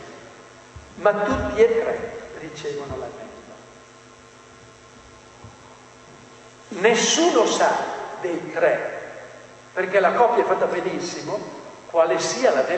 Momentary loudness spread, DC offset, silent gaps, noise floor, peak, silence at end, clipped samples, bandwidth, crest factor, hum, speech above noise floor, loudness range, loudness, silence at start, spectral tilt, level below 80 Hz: 22 LU; under 0.1%; none; -47 dBFS; -4 dBFS; 0 s; under 0.1%; 9 kHz; 20 dB; none; 26 dB; 15 LU; -21 LUFS; 0 s; -3 dB/octave; -52 dBFS